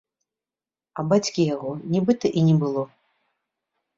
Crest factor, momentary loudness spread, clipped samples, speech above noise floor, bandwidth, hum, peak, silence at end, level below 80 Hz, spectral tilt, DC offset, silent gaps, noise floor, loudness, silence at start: 18 dB; 11 LU; under 0.1%; over 69 dB; 7.8 kHz; none; -6 dBFS; 1.1 s; -64 dBFS; -7 dB/octave; under 0.1%; none; under -90 dBFS; -23 LUFS; 0.95 s